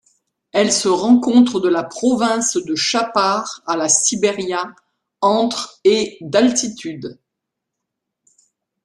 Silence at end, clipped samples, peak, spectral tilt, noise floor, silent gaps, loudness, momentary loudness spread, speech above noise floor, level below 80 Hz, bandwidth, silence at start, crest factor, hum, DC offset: 1.7 s; under 0.1%; -2 dBFS; -3 dB/octave; -80 dBFS; none; -17 LUFS; 10 LU; 63 dB; -62 dBFS; 12 kHz; 0.55 s; 18 dB; none; under 0.1%